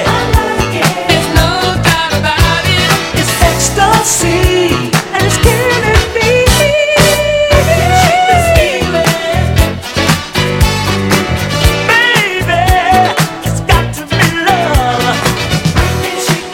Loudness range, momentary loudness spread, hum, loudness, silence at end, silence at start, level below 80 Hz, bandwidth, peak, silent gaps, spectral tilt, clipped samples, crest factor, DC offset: 2 LU; 5 LU; none; -10 LUFS; 0 s; 0 s; -20 dBFS; 17.5 kHz; 0 dBFS; none; -4 dB/octave; 0.5%; 10 dB; under 0.1%